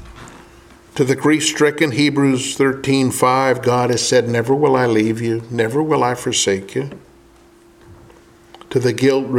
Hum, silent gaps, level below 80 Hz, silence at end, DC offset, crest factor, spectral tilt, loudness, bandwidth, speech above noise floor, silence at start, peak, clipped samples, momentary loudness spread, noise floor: none; none; -52 dBFS; 0 s; under 0.1%; 16 dB; -4.5 dB/octave; -16 LUFS; 16 kHz; 32 dB; 0 s; 0 dBFS; under 0.1%; 7 LU; -48 dBFS